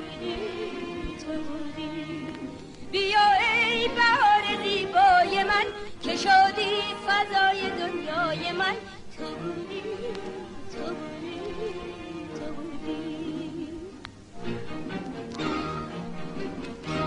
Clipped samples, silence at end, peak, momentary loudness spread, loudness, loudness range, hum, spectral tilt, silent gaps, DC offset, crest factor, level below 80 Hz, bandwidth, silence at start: under 0.1%; 0 s; -8 dBFS; 18 LU; -26 LUFS; 14 LU; none; -4 dB/octave; none; under 0.1%; 18 dB; -52 dBFS; 11 kHz; 0 s